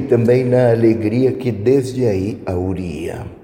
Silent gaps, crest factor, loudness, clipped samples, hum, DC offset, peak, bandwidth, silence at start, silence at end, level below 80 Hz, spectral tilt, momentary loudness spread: none; 12 dB; -16 LUFS; under 0.1%; none; under 0.1%; -4 dBFS; 16 kHz; 0 s; 0.1 s; -44 dBFS; -8.5 dB/octave; 10 LU